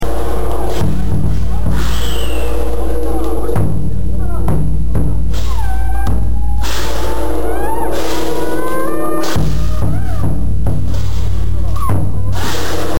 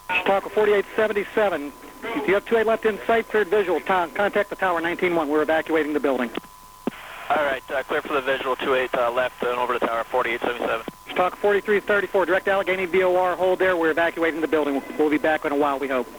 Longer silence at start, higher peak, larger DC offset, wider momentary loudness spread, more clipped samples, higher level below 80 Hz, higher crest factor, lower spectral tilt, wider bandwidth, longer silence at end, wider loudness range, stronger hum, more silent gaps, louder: about the same, 0 s vs 0.05 s; first, -2 dBFS vs -10 dBFS; first, 40% vs under 0.1%; second, 2 LU vs 6 LU; neither; first, -20 dBFS vs -54 dBFS; about the same, 10 dB vs 14 dB; about the same, -6 dB/octave vs -5 dB/octave; second, 17 kHz vs over 20 kHz; about the same, 0 s vs 0 s; about the same, 1 LU vs 3 LU; neither; neither; first, -18 LUFS vs -22 LUFS